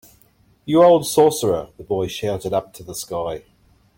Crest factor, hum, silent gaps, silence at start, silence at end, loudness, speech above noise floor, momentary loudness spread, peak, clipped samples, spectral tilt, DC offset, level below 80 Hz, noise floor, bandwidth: 18 dB; none; none; 0.65 s; 0.6 s; -19 LUFS; 38 dB; 18 LU; -2 dBFS; under 0.1%; -5 dB/octave; under 0.1%; -52 dBFS; -56 dBFS; 17 kHz